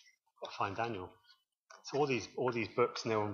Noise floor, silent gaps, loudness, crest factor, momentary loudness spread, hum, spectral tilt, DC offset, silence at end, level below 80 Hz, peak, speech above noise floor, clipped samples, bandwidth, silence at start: -65 dBFS; 1.57-1.67 s; -36 LUFS; 20 dB; 16 LU; none; -5 dB/octave; under 0.1%; 0 s; -78 dBFS; -18 dBFS; 30 dB; under 0.1%; 7.4 kHz; 0.4 s